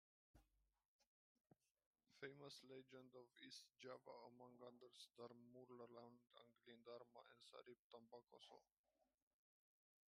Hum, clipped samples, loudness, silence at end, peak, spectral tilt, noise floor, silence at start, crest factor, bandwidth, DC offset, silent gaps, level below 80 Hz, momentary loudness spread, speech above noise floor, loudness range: none; under 0.1%; -64 LUFS; 1.05 s; -42 dBFS; -4 dB/octave; -87 dBFS; 0.35 s; 24 dB; 11 kHz; under 0.1%; 0.88-0.99 s, 1.07-1.35 s, 1.71-1.75 s, 1.86-1.93 s, 7.79-7.90 s, 8.79-8.84 s; under -90 dBFS; 7 LU; 22 dB; 4 LU